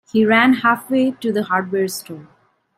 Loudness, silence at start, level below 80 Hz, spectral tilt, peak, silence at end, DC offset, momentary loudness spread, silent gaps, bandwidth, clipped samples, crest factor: -17 LUFS; 0.15 s; -62 dBFS; -5 dB/octave; -2 dBFS; 0.55 s; under 0.1%; 16 LU; none; 16 kHz; under 0.1%; 16 dB